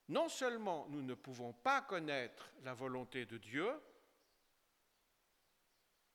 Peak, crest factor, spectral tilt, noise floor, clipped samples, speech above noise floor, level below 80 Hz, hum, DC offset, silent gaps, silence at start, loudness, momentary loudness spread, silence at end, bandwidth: -22 dBFS; 22 dB; -4 dB/octave; -80 dBFS; under 0.1%; 37 dB; -84 dBFS; none; under 0.1%; none; 0.1 s; -43 LUFS; 13 LU; 2.25 s; 19 kHz